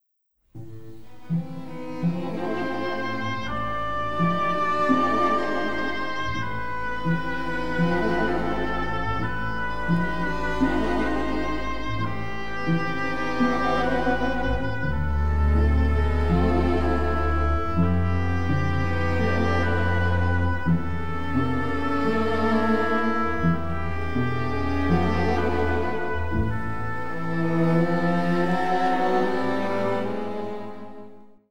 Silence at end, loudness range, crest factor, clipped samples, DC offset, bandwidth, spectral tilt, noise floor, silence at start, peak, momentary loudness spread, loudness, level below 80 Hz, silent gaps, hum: 0 s; 3 LU; 16 dB; under 0.1%; 4%; 9.8 kHz; -7.5 dB/octave; -70 dBFS; 0 s; -8 dBFS; 8 LU; -25 LUFS; -34 dBFS; none; none